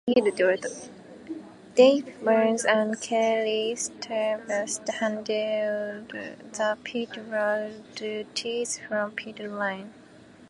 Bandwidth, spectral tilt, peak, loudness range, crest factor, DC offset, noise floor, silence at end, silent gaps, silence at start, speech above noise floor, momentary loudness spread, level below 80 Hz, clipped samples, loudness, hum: 11.5 kHz; -3 dB/octave; -6 dBFS; 7 LU; 20 dB; under 0.1%; -51 dBFS; 0.05 s; none; 0.05 s; 25 dB; 16 LU; -72 dBFS; under 0.1%; -26 LUFS; none